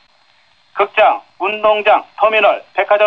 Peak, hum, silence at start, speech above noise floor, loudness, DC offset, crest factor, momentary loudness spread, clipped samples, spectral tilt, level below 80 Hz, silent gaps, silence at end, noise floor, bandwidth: -2 dBFS; none; 0.75 s; 41 dB; -14 LUFS; under 0.1%; 14 dB; 8 LU; under 0.1%; -4.5 dB/octave; -58 dBFS; none; 0 s; -54 dBFS; 5.4 kHz